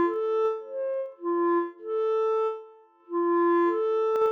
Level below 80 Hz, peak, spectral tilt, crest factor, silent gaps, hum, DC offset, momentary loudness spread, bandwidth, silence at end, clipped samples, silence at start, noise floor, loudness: -82 dBFS; -16 dBFS; -5.5 dB/octave; 10 dB; none; none; under 0.1%; 9 LU; 6 kHz; 0 s; under 0.1%; 0 s; -51 dBFS; -27 LUFS